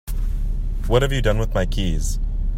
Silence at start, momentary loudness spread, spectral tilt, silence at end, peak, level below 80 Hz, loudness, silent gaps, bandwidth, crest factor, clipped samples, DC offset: 0.05 s; 9 LU; -5.5 dB/octave; 0 s; -4 dBFS; -22 dBFS; -23 LUFS; none; 15 kHz; 16 dB; under 0.1%; under 0.1%